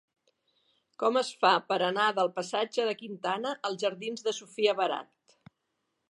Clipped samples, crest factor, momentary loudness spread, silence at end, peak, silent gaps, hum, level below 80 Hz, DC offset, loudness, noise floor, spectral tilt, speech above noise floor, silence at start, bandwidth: under 0.1%; 24 dB; 8 LU; 1.05 s; -8 dBFS; none; none; -86 dBFS; under 0.1%; -29 LUFS; -81 dBFS; -3 dB/octave; 51 dB; 1 s; 11.5 kHz